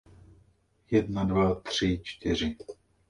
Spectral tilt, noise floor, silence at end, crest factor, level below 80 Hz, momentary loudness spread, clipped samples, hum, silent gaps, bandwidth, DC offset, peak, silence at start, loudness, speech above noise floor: -6 dB/octave; -65 dBFS; 0.35 s; 18 dB; -46 dBFS; 8 LU; under 0.1%; none; none; 11 kHz; under 0.1%; -12 dBFS; 0.9 s; -28 LUFS; 37 dB